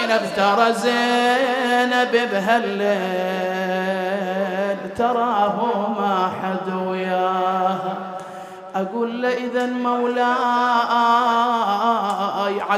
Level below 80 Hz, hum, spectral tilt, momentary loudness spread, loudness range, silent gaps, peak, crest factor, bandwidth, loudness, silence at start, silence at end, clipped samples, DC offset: -66 dBFS; none; -5 dB/octave; 7 LU; 4 LU; none; -4 dBFS; 16 dB; 15 kHz; -20 LUFS; 0 s; 0 s; under 0.1%; under 0.1%